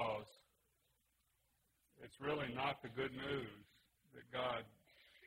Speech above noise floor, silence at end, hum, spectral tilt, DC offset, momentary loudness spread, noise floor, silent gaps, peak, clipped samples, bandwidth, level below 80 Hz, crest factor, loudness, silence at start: 37 dB; 0 s; none; -6 dB/octave; under 0.1%; 20 LU; -82 dBFS; none; -28 dBFS; under 0.1%; 16 kHz; -74 dBFS; 20 dB; -44 LUFS; 0 s